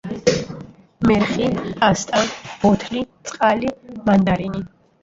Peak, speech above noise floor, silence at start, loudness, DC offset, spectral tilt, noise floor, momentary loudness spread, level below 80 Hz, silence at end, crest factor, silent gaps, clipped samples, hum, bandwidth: -2 dBFS; 19 dB; 0.05 s; -19 LUFS; under 0.1%; -5.5 dB/octave; -38 dBFS; 12 LU; -44 dBFS; 0.35 s; 18 dB; none; under 0.1%; none; 7.8 kHz